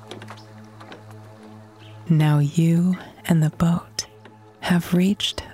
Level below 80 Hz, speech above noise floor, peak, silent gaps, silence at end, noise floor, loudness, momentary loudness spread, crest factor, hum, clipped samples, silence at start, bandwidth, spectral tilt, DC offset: -54 dBFS; 28 dB; -6 dBFS; none; 0 s; -47 dBFS; -21 LUFS; 23 LU; 16 dB; none; under 0.1%; 0 s; 15.5 kHz; -6 dB/octave; under 0.1%